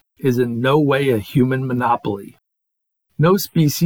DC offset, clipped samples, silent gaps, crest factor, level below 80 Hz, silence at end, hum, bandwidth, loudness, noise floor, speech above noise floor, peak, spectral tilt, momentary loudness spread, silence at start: under 0.1%; under 0.1%; none; 14 dB; -56 dBFS; 0 s; none; 19.5 kHz; -18 LUFS; -77 dBFS; 60 dB; -4 dBFS; -6.5 dB/octave; 7 LU; 0.2 s